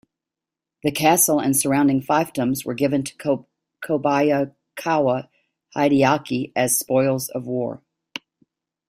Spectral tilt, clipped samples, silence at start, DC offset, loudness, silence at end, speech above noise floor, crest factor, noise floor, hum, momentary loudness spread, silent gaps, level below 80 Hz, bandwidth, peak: -4.5 dB/octave; under 0.1%; 0.85 s; under 0.1%; -21 LUFS; 1.1 s; 67 dB; 20 dB; -87 dBFS; none; 13 LU; none; -60 dBFS; 16 kHz; -2 dBFS